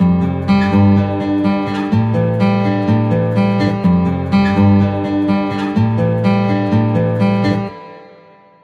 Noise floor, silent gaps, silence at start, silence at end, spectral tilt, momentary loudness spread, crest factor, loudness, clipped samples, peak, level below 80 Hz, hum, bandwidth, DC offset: -44 dBFS; none; 0 s; 0.55 s; -9 dB/octave; 5 LU; 12 dB; -15 LUFS; under 0.1%; -2 dBFS; -42 dBFS; none; 7.2 kHz; under 0.1%